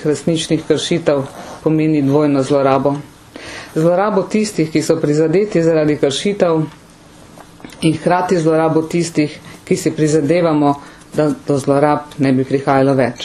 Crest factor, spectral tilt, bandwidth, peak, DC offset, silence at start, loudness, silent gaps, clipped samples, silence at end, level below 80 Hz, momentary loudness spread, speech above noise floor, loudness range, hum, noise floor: 16 dB; -6 dB/octave; 13.5 kHz; 0 dBFS; under 0.1%; 0 s; -15 LUFS; none; under 0.1%; 0 s; -50 dBFS; 7 LU; 27 dB; 2 LU; none; -41 dBFS